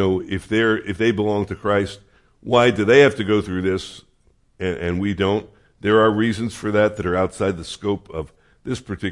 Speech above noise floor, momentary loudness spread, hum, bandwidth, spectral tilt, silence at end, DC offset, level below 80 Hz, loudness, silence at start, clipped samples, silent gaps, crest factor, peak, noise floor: 39 dB; 13 LU; none; 11.5 kHz; -6 dB/octave; 0 s; under 0.1%; -50 dBFS; -20 LUFS; 0 s; under 0.1%; none; 18 dB; -2 dBFS; -59 dBFS